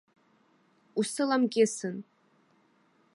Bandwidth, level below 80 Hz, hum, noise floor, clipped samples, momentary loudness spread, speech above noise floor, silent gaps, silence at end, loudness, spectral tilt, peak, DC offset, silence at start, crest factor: 11.5 kHz; -86 dBFS; none; -67 dBFS; under 0.1%; 12 LU; 39 dB; none; 1.15 s; -29 LUFS; -4 dB/octave; -12 dBFS; under 0.1%; 0.95 s; 20 dB